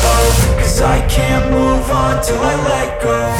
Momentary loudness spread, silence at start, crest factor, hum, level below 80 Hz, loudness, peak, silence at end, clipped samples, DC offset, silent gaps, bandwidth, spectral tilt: 4 LU; 0 s; 12 dB; none; -18 dBFS; -14 LUFS; 0 dBFS; 0 s; under 0.1%; under 0.1%; none; 17.5 kHz; -5 dB/octave